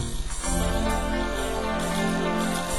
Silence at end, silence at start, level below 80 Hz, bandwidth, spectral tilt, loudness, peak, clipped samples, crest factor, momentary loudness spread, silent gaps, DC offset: 0 s; 0 s; -32 dBFS; 16 kHz; -4.5 dB/octave; -27 LUFS; -12 dBFS; under 0.1%; 14 dB; 3 LU; none; 1%